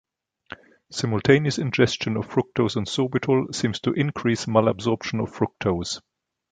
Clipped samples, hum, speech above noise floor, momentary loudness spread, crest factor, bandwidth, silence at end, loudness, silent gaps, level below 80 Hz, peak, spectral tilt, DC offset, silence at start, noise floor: under 0.1%; none; 22 dB; 13 LU; 22 dB; 9.4 kHz; 0.5 s; -23 LUFS; none; -52 dBFS; -2 dBFS; -5.5 dB/octave; under 0.1%; 0.9 s; -45 dBFS